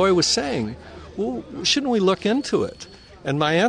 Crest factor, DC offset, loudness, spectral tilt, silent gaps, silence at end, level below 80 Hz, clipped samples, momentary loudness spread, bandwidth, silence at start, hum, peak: 16 dB; under 0.1%; -22 LUFS; -4 dB/octave; none; 0 s; -50 dBFS; under 0.1%; 17 LU; 10.5 kHz; 0 s; none; -6 dBFS